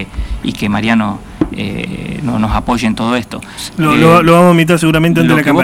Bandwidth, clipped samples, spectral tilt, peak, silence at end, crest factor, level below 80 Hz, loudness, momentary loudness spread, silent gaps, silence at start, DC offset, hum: 16.5 kHz; under 0.1%; -6 dB/octave; 0 dBFS; 0 s; 12 dB; -28 dBFS; -12 LUFS; 14 LU; none; 0 s; under 0.1%; none